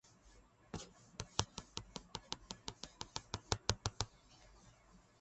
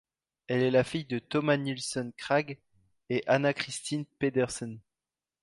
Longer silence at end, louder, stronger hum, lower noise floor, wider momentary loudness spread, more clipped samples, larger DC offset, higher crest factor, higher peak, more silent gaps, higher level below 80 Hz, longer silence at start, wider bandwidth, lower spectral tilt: second, 0.2 s vs 0.65 s; second, -45 LUFS vs -30 LUFS; neither; second, -66 dBFS vs under -90 dBFS; first, 25 LU vs 11 LU; neither; neither; first, 34 dB vs 22 dB; second, -14 dBFS vs -10 dBFS; neither; first, -58 dBFS vs -66 dBFS; second, 0.05 s vs 0.5 s; second, 8.4 kHz vs 11.5 kHz; second, -3 dB/octave vs -5 dB/octave